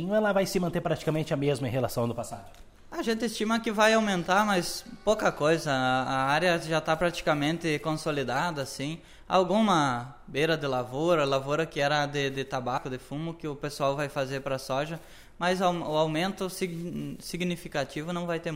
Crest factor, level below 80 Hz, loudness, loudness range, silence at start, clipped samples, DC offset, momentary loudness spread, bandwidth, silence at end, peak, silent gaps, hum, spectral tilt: 20 dB; -52 dBFS; -28 LUFS; 5 LU; 0 s; under 0.1%; under 0.1%; 11 LU; 16 kHz; 0 s; -8 dBFS; none; none; -5 dB/octave